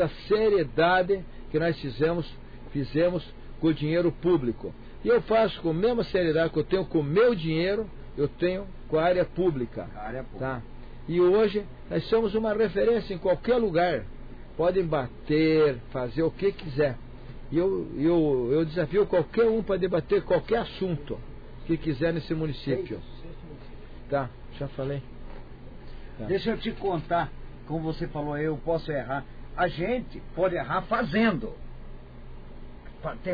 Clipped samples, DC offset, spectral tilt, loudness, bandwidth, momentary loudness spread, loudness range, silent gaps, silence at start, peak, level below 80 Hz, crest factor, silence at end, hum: under 0.1%; under 0.1%; -9 dB/octave; -27 LUFS; 5 kHz; 22 LU; 7 LU; none; 0 s; -14 dBFS; -42 dBFS; 14 dB; 0 s; none